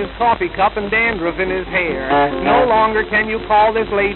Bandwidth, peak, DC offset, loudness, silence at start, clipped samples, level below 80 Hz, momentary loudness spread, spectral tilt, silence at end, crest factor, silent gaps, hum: 4.3 kHz; -2 dBFS; under 0.1%; -16 LUFS; 0 s; under 0.1%; -36 dBFS; 5 LU; -9 dB/octave; 0 s; 14 dB; none; none